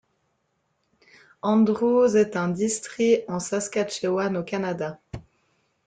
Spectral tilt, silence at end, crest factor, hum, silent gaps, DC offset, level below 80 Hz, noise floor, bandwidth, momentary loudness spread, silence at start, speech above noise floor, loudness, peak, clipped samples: -5.5 dB/octave; 0.65 s; 16 dB; none; none; under 0.1%; -60 dBFS; -73 dBFS; 9.6 kHz; 12 LU; 1.45 s; 50 dB; -24 LUFS; -8 dBFS; under 0.1%